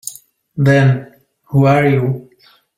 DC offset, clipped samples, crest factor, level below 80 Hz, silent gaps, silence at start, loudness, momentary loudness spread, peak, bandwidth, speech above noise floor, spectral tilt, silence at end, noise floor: under 0.1%; under 0.1%; 14 dB; -50 dBFS; none; 0.05 s; -14 LUFS; 16 LU; -2 dBFS; 16.5 kHz; 22 dB; -7 dB/octave; 0.55 s; -34 dBFS